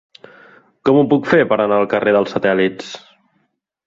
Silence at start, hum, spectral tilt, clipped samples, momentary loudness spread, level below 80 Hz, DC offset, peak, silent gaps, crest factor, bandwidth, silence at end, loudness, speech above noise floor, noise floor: 0.85 s; none; -7 dB/octave; under 0.1%; 14 LU; -58 dBFS; under 0.1%; -2 dBFS; none; 16 dB; 7.6 kHz; 0.9 s; -15 LUFS; 52 dB; -66 dBFS